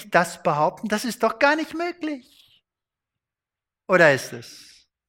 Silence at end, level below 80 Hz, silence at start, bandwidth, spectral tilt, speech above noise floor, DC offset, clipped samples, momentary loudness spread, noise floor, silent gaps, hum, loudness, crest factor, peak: 0.5 s; -66 dBFS; 0 s; 16.5 kHz; -4.5 dB/octave; 67 dB; under 0.1%; under 0.1%; 19 LU; -89 dBFS; none; none; -21 LUFS; 22 dB; -2 dBFS